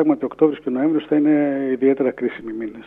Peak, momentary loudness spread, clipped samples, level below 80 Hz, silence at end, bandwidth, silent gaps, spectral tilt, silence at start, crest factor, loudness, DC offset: -2 dBFS; 9 LU; under 0.1%; -62 dBFS; 0.05 s; 3.8 kHz; none; -9.5 dB/octave; 0 s; 16 dB; -19 LUFS; under 0.1%